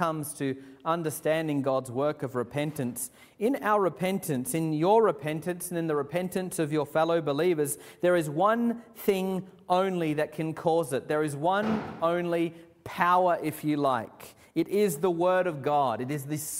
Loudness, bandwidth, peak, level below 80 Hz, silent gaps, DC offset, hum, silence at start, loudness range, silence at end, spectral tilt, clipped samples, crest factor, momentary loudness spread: -28 LUFS; 16 kHz; -8 dBFS; -68 dBFS; none; under 0.1%; none; 0 s; 2 LU; 0 s; -5.5 dB/octave; under 0.1%; 20 dB; 8 LU